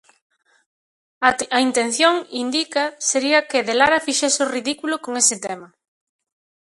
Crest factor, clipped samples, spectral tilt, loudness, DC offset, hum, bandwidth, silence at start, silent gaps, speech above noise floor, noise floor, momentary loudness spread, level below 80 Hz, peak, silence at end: 20 dB; under 0.1%; -0.5 dB/octave; -19 LUFS; under 0.1%; none; 11.5 kHz; 1.2 s; none; over 71 dB; under -90 dBFS; 8 LU; -62 dBFS; 0 dBFS; 1 s